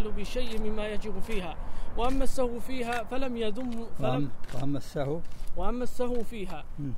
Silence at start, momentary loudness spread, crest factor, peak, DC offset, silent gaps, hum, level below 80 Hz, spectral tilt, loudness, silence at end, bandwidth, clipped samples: 0 s; 8 LU; 14 dB; -12 dBFS; under 0.1%; none; none; -34 dBFS; -6 dB/octave; -34 LUFS; 0 s; 12 kHz; under 0.1%